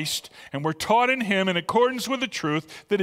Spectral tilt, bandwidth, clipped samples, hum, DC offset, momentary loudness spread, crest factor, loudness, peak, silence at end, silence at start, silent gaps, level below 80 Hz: -4 dB/octave; 16 kHz; under 0.1%; none; under 0.1%; 9 LU; 18 dB; -24 LUFS; -8 dBFS; 0 s; 0 s; none; -62 dBFS